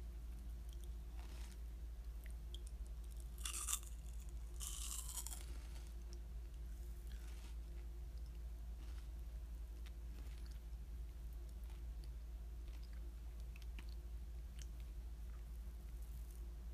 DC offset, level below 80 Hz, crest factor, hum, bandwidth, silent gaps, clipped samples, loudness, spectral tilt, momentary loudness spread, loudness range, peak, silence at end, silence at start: under 0.1%; -50 dBFS; 26 dB; none; 15.5 kHz; none; under 0.1%; -52 LUFS; -3 dB/octave; 7 LU; 6 LU; -22 dBFS; 0 s; 0 s